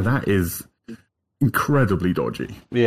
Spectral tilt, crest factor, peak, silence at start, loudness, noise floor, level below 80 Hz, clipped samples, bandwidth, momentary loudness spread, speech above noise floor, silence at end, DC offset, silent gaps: -6.5 dB/octave; 14 dB; -6 dBFS; 0 s; -22 LUFS; -44 dBFS; -48 dBFS; under 0.1%; 16.5 kHz; 20 LU; 23 dB; 0 s; under 0.1%; none